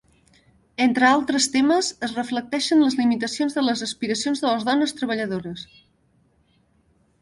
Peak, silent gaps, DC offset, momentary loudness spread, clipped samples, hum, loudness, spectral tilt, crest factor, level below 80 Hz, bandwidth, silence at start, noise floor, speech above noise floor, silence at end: -4 dBFS; none; under 0.1%; 10 LU; under 0.1%; none; -21 LUFS; -3 dB/octave; 18 dB; -62 dBFS; 11.5 kHz; 0.8 s; -63 dBFS; 41 dB; 1.6 s